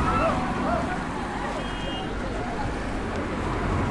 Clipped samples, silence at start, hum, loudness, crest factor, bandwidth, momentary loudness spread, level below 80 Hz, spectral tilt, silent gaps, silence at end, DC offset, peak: under 0.1%; 0 s; none; -28 LUFS; 16 dB; 11.5 kHz; 6 LU; -36 dBFS; -6 dB/octave; none; 0 s; under 0.1%; -12 dBFS